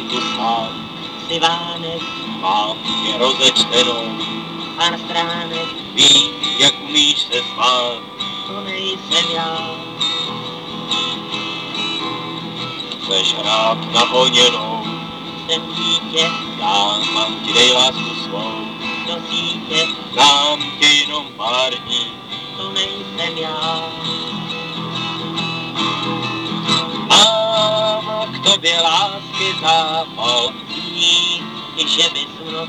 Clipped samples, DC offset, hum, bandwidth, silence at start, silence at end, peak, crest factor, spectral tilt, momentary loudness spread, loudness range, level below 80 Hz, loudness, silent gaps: under 0.1%; under 0.1%; none; 18.5 kHz; 0 s; 0 s; 0 dBFS; 18 dB; -2 dB/octave; 13 LU; 7 LU; -60 dBFS; -16 LUFS; none